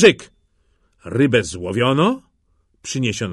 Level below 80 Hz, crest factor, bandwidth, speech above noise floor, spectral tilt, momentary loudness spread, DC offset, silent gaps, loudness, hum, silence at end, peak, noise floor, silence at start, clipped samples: -52 dBFS; 18 dB; 11.5 kHz; 46 dB; -5 dB/octave; 14 LU; under 0.1%; none; -19 LUFS; none; 0 s; 0 dBFS; -63 dBFS; 0 s; under 0.1%